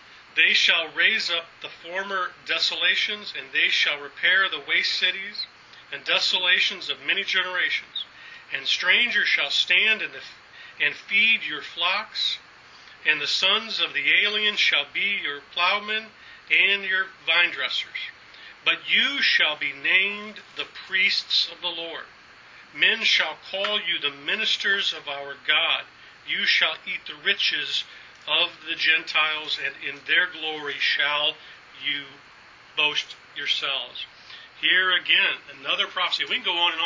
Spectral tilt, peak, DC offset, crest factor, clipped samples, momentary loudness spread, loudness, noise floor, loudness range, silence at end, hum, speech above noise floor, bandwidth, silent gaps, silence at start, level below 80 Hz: -0.5 dB/octave; -4 dBFS; under 0.1%; 22 dB; under 0.1%; 14 LU; -22 LUFS; -49 dBFS; 3 LU; 0 s; none; 25 dB; 7.6 kHz; none; 0.1 s; -72 dBFS